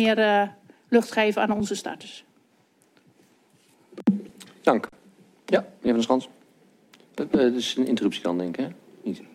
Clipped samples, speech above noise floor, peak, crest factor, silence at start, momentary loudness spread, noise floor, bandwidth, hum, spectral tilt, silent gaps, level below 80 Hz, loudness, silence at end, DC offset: under 0.1%; 39 dB; -4 dBFS; 22 dB; 0 s; 16 LU; -63 dBFS; 14 kHz; none; -5 dB/octave; none; -66 dBFS; -25 LUFS; 0.1 s; under 0.1%